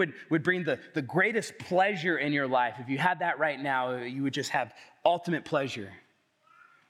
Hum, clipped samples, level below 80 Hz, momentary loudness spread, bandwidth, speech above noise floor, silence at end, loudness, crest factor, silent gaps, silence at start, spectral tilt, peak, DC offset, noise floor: none; under 0.1%; -80 dBFS; 7 LU; 14.5 kHz; 36 dB; 0.9 s; -29 LUFS; 20 dB; none; 0 s; -5.5 dB/octave; -10 dBFS; under 0.1%; -65 dBFS